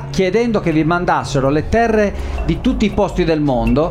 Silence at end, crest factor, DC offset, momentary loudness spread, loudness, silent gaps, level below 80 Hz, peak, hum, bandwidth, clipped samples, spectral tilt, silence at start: 0 s; 12 dB; under 0.1%; 3 LU; -16 LUFS; none; -26 dBFS; -2 dBFS; none; 13 kHz; under 0.1%; -6.5 dB/octave; 0 s